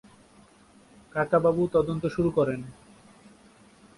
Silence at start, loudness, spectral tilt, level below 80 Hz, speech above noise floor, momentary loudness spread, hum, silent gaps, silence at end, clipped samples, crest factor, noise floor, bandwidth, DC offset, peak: 1.15 s; -26 LUFS; -8 dB/octave; -56 dBFS; 31 dB; 12 LU; none; none; 1.25 s; under 0.1%; 18 dB; -56 dBFS; 11.5 kHz; under 0.1%; -10 dBFS